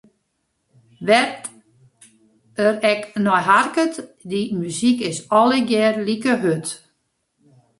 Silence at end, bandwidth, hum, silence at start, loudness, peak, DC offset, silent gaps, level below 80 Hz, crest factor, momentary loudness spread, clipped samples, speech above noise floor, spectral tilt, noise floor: 1.05 s; 11.5 kHz; none; 1 s; -19 LUFS; -2 dBFS; under 0.1%; none; -64 dBFS; 18 dB; 14 LU; under 0.1%; 53 dB; -4.5 dB/octave; -72 dBFS